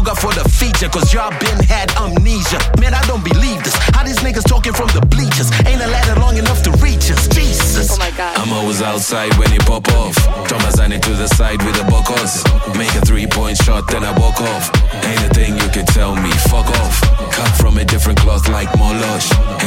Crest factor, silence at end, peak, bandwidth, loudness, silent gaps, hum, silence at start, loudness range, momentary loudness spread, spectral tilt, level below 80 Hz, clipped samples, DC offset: 12 dB; 0 s; 0 dBFS; 17 kHz; -13 LUFS; none; none; 0 s; 1 LU; 3 LU; -4.5 dB/octave; -14 dBFS; under 0.1%; under 0.1%